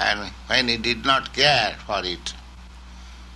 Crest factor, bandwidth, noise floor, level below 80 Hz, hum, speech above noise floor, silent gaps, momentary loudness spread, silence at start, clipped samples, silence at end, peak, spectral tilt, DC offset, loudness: 20 dB; 12 kHz; -42 dBFS; -42 dBFS; 60 Hz at -45 dBFS; 19 dB; none; 13 LU; 0 s; under 0.1%; 0 s; -4 dBFS; -3 dB/octave; under 0.1%; -21 LUFS